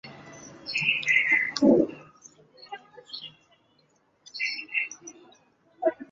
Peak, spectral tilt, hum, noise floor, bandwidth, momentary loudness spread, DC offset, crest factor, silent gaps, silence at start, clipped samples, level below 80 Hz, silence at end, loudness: -8 dBFS; -4 dB/octave; none; -66 dBFS; 7.6 kHz; 24 LU; under 0.1%; 22 dB; none; 0.05 s; under 0.1%; -70 dBFS; 0.05 s; -24 LUFS